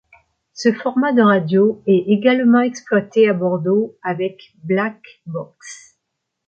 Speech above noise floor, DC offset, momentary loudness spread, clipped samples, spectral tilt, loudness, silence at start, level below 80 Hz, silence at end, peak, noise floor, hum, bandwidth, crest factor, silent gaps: 60 dB; under 0.1%; 16 LU; under 0.1%; -6.5 dB/octave; -17 LUFS; 0.55 s; -68 dBFS; 0.7 s; -2 dBFS; -77 dBFS; none; 8.8 kHz; 16 dB; none